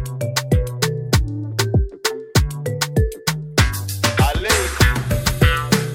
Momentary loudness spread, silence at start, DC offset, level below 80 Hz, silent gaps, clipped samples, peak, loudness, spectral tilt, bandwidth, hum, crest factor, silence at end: 6 LU; 0 s; under 0.1%; -26 dBFS; none; under 0.1%; -2 dBFS; -19 LUFS; -4.5 dB/octave; 17 kHz; none; 18 dB; 0 s